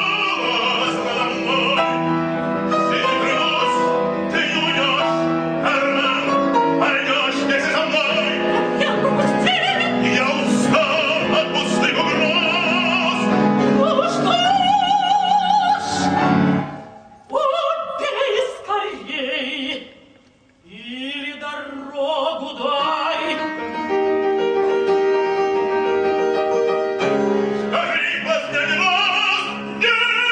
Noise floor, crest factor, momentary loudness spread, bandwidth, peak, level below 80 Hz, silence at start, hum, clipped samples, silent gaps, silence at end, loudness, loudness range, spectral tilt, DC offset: -53 dBFS; 16 dB; 7 LU; 10 kHz; -4 dBFS; -58 dBFS; 0 s; none; under 0.1%; none; 0 s; -18 LUFS; 7 LU; -4.5 dB/octave; under 0.1%